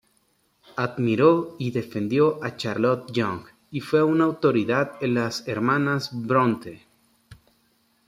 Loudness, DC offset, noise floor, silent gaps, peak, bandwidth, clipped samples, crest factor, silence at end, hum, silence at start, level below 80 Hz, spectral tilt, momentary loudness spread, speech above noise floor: -23 LUFS; under 0.1%; -67 dBFS; none; -4 dBFS; 15 kHz; under 0.1%; 20 dB; 0.75 s; none; 0.75 s; -64 dBFS; -7 dB/octave; 10 LU; 44 dB